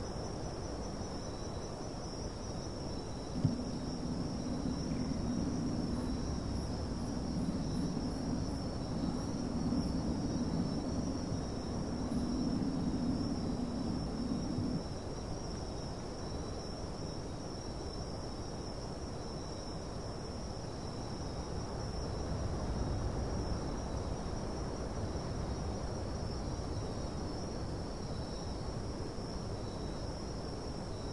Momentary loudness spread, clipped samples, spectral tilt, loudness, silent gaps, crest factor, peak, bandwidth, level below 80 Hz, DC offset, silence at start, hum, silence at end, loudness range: 7 LU; under 0.1%; -6 dB/octave; -39 LUFS; none; 20 dB; -18 dBFS; 11.5 kHz; -46 dBFS; 0.2%; 0 s; none; 0 s; 6 LU